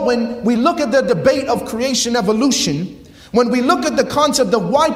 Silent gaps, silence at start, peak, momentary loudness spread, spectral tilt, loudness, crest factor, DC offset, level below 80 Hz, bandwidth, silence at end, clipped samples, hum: none; 0 s; 0 dBFS; 5 LU; -4 dB/octave; -16 LUFS; 14 dB; under 0.1%; -46 dBFS; 16 kHz; 0 s; under 0.1%; none